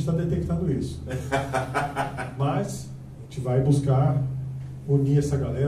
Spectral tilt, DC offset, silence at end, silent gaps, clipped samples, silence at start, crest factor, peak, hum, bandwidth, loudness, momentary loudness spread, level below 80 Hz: -7.5 dB/octave; under 0.1%; 0 s; none; under 0.1%; 0 s; 16 dB; -8 dBFS; none; 12.5 kHz; -26 LUFS; 13 LU; -44 dBFS